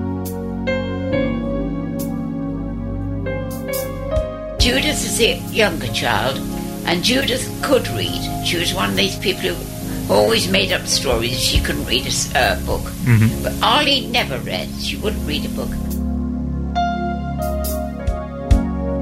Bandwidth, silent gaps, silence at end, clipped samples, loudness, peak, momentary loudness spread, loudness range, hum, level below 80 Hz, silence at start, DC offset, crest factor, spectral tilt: 16 kHz; none; 0 s; under 0.1%; -19 LUFS; 0 dBFS; 9 LU; 6 LU; none; -28 dBFS; 0 s; under 0.1%; 20 dB; -4 dB/octave